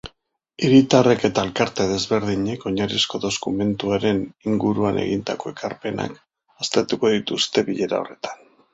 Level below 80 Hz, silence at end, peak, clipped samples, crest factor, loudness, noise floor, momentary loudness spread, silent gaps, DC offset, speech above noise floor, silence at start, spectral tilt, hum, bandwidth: -52 dBFS; 0.4 s; -2 dBFS; under 0.1%; 20 dB; -21 LUFS; -64 dBFS; 13 LU; none; under 0.1%; 43 dB; 0.05 s; -5 dB/octave; none; 8 kHz